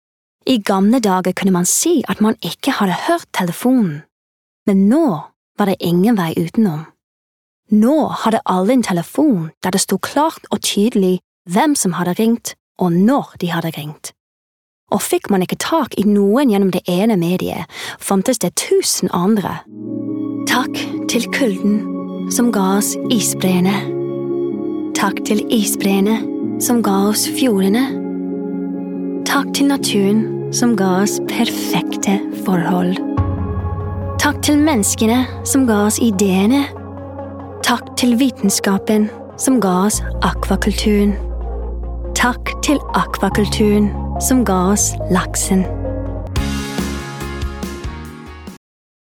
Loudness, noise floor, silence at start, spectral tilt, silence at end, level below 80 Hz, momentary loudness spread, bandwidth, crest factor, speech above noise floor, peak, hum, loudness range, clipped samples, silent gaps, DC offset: -16 LUFS; under -90 dBFS; 0.45 s; -4.5 dB/octave; 0.5 s; -32 dBFS; 10 LU; 18 kHz; 16 dB; over 75 dB; 0 dBFS; none; 2 LU; under 0.1%; 4.12-4.66 s, 5.36-5.55 s, 7.04-7.63 s, 9.57-9.61 s, 11.24-11.45 s, 12.60-12.75 s, 14.20-14.87 s; under 0.1%